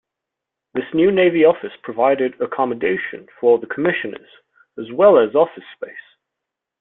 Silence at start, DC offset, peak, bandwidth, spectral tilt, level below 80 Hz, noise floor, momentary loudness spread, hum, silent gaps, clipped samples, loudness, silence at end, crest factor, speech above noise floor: 0.75 s; under 0.1%; -2 dBFS; 4 kHz; -10.5 dB/octave; -62 dBFS; -83 dBFS; 20 LU; none; none; under 0.1%; -17 LUFS; 0.8 s; 18 dB; 66 dB